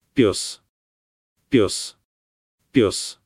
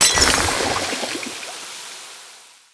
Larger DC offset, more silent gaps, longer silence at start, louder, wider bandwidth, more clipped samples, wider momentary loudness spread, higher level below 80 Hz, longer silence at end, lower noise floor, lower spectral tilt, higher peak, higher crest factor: neither; first, 0.69-1.36 s, 2.04-2.58 s vs none; first, 0.15 s vs 0 s; about the same, -21 LUFS vs -19 LUFS; first, 15 kHz vs 11 kHz; neither; second, 12 LU vs 22 LU; second, -54 dBFS vs -40 dBFS; second, 0.15 s vs 0.3 s; first, under -90 dBFS vs -45 dBFS; first, -4.5 dB/octave vs -1 dB/octave; second, -4 dBFS vs 0 dBFS; about the same, 20 dB vs 22 dB